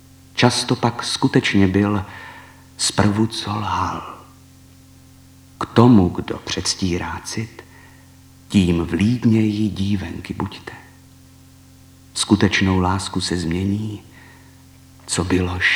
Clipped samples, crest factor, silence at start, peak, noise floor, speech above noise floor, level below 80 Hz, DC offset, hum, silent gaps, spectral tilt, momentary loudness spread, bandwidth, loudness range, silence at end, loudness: under 0.1%; 20 dB; 0.35 s; 0 dBFS; -46 dBFS; 28 dB; -46 dBFS; under 0.1%; none; none; -5 dB/octave; 15 LU; 19 kHz; 4 LU; 0 s; -19 LUFS